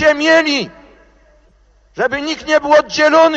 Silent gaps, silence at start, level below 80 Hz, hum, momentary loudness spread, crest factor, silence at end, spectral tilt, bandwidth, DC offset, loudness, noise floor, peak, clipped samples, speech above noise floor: none; 0 s; -48 dBFS; none; 10 LU; 14 dB; 0 s; -3 dB/octave; 8 kHz; under 0.1%; -13 LUFS; -51 dBFS; 0 dBFS; under 0.1%; 38 dB